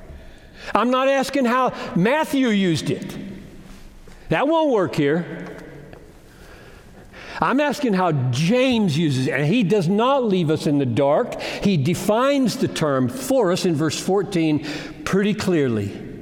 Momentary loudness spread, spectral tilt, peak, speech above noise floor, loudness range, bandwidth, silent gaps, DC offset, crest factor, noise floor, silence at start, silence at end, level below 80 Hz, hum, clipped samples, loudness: 11 LU; -6 dB/octave; 0 dBFS; 25 dB; 5 LU; 17.5 kHz; none; under 0.1%; 20 dB; -44 dBFS; 0 s; 0 s; -50 dBFS; none; under 0.1%; -20 LUFS